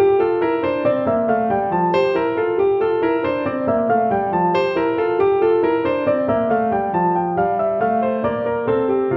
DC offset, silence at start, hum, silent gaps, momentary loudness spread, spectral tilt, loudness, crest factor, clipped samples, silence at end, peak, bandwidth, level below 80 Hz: under 0.1%; 0 s; none; none; 3 LU; -9 dB/octave; -18 LUFS; 12 dB; under 0.1%; 0 s; -6 dBFS; 5.8 kHz; -50 dBFS